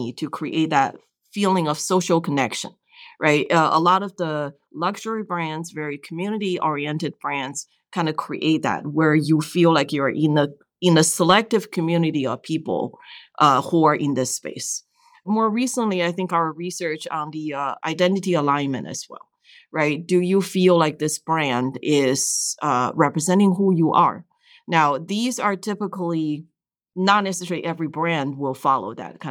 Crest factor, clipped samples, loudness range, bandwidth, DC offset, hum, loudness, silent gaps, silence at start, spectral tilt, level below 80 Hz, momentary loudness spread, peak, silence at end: 18 dB; under 0.1%; 5 LU; 18 kHz; under 0.1%; none; -21 LUFS; none; 0 s; -4.5 dB/octave; -72 dBFS; 11 LU; -4 dBFS; 0 s